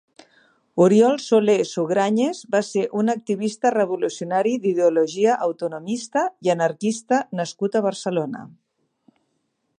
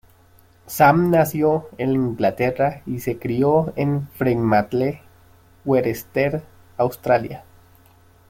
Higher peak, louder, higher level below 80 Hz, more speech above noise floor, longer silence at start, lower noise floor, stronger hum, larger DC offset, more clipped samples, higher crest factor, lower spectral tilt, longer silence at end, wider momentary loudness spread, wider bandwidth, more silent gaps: about the same, -4 dBFS vs -2 dBFS; about the same, -21 LUFS vs -20 LUFS; second, -74 dBFS vs -52 dBFS; first, 52 dB vs 33 dB; about the same, 0.75 s vs 0.65 s; first, -72 dBFS vs -53 dBFS; neither; neither; neither; about the same, 18 dB vs 18 dB; second, -5.5 dB/octave vs -7 dB/octave; first, 1.3 s vs 0.9 s; second, 9 LU vs 12 LU; second, 10.5 kHz vs 16.5 kHz; neither